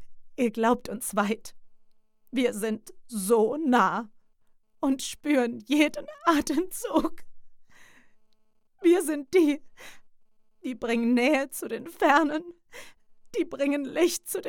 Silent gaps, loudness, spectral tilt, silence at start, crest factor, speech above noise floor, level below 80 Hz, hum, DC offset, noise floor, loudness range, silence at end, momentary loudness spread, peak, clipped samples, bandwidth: none; -26 LUFS; -4 dB/octave; 0 s; 20 dB; 36 dB; -60 dBFS; none; under 0.1%; -62 dBFS; 2 LU; 0 s; 13 LU; -8 dBFS; under 0.1%; 18 kHz